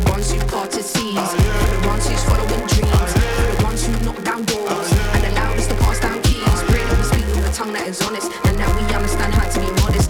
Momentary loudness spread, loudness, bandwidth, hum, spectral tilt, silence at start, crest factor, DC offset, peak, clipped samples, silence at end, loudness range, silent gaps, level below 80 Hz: 5 LU; -19 LUFS; 19 kHz; none; -5 dB/octave; 0 s; 12 dB; under 0.1%; -4 dBFS; under 0.1%; 0 s; 1 LU; none; -20 dBFS